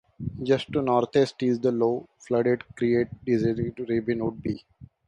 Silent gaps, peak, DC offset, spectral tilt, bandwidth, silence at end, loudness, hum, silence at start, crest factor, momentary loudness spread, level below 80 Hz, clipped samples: none; -8 dBFS; under 0.1%; -7.5 dB/octave; 9.8 kHz; 0.2 s; -26 LUFS; none; 0.2 s; 18 dB; 9 LU; -54 dBFS; under 0.1%